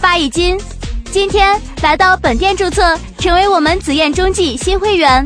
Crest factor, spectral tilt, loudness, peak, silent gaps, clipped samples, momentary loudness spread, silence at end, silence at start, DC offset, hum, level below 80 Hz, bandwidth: 12 dB; -4 dB/octave; -12 LUFS; 0 dBFS; none; under 0.1%; 6 LU; 0 s; 0 s; under 0.1%; none; -24 dBFS; 11 kHz